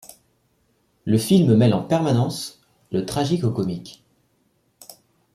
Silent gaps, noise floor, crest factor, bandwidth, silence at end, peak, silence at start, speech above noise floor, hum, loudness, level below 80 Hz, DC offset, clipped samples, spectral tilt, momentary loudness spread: none; -66 dBFS; 18 dB; 15.5 kHz; 0.45 s; -4 dBFS; 1.05 s; 46 dB; none; -20 LUFS; -56 dBFS; under 0.1%; under 0.1%; -7 dB/octave; 18 LU